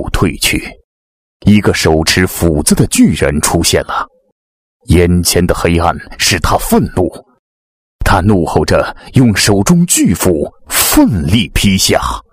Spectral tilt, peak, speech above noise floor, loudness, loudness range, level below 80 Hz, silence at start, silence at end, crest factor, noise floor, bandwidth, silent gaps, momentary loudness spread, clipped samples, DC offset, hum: -4.5 dB/octave; 0 dBFS; over 79 dB; -11 LUFS; 3 LU; -24 dBFS; 0 s; 0.1 s; 12 dB; under -90 dBFS; 16.5 kHz; 0.84-1.40 s, 4.32-4.80 s, 7.39-7.99 s; 7 LU; 0.3%; under 0.1%; none